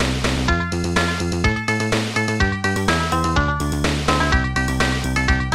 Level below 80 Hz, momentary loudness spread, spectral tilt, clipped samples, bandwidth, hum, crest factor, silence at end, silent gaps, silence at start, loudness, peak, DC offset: -28 dBFS; 2 LU; -4.5 dB/octave; under 0.1%; 15 kHz; none; 16 dB; 0 s; none; 0 s; -20 LUFS; -4 dBFS; under 0.1%